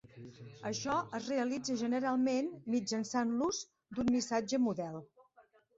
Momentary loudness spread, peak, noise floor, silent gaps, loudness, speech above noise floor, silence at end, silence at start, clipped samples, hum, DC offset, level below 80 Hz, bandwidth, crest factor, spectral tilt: 12 LU; -20 dBFS; -67 dBFS; none; -35 LUFS; 32 dB; 0.35 s; 0.15 s; under 0.1%; none; under 0.1%; -70 dBFS; 8 kHz; 16 dB; -4.5 dB/octave